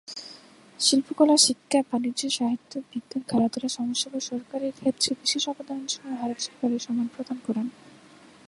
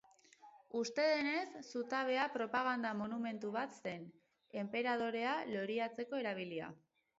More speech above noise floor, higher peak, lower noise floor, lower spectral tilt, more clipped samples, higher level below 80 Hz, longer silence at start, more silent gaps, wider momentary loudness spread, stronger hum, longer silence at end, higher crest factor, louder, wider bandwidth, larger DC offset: about the same, 26 dB vs 25 dB; first, -4 dBFS vs -22 dBFS; second, -52 dBFS vs -64 dBFS; about the same, -2.5 dB/octave vs -2.5 dB/octave; neither; first, -70 dBFS vs -84 dBFS; second, 0.1 s vs 0.45 s; neither; first, 13 LU vs 10 LU; neither; first, 0.6 s vs 0.4 s; about the same, 22 dB vs 18 dB; first, -26 LUFS vs -39 LUFS; first, 11.5 kHz vs 7.6 kHz; neither